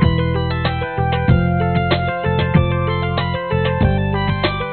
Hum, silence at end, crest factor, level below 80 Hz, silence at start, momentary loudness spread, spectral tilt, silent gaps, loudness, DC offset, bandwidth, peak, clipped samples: none; 0 s; 16 dB; -28 dBFS; 0 s; 4 LU; -5.5 dB/octave; none; -18 LUFS; 0.3%; 4.5 kHz; 0 dBFS; under 0.1%